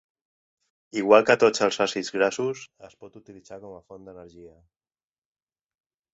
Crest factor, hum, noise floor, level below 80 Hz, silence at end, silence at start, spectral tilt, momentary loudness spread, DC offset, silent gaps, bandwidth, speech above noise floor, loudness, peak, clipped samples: 24 dB; none; under -90 dBFS; -68 dBFS; 1.65 s; 0.95 s; -3.5 dB/octave; 26 LU; under 0.1%; none; 8 kHz; over 65 dB; -22 LUFS; -2 dBFS; under 0.1%